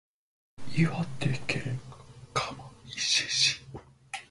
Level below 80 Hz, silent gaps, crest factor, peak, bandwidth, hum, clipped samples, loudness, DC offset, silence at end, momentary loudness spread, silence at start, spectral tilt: -58 dBFS; none; 20 dB; -12 dBFS; 11.5 kHz; none; under 0.1%; -29 LUFS; under 0.1%; 0.05 s; 22 LU; 0.6 s; -3 dB/octave